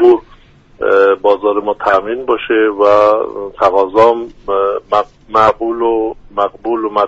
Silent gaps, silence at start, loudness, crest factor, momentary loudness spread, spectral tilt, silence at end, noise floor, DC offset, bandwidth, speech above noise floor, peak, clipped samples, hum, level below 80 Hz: none; 0 s; -13 LUFS; 12 dB; 8 LU; -6 dB/octave; 0 s; -43 dBFS; under 0.1%; 7.8 kHz; 30 dB; 0 dBFS; under 0.1%; none; -44 dBFS